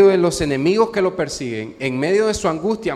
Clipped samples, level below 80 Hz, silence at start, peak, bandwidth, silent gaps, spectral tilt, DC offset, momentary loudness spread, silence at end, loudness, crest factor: under 0.1%; -44 dBFS; 0 s; -2 dBFS; 13 kHz; none; -5 dB/octave; under 0.1%; 8 LU; 0 s; -19 LUFS; 16 dB